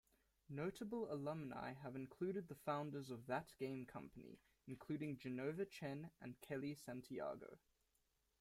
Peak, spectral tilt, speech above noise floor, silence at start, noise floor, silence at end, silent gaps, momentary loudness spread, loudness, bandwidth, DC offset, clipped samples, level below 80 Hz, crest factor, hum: -30 dBFS; -7 dB/octave; 36 dB; 0.5 s; -85 dBFS; 0.85 s; none; 11 LU; -49 LUFS; 16 kHz; under 0.1%; under 0.1%; -80 dBFS; 20 dB; none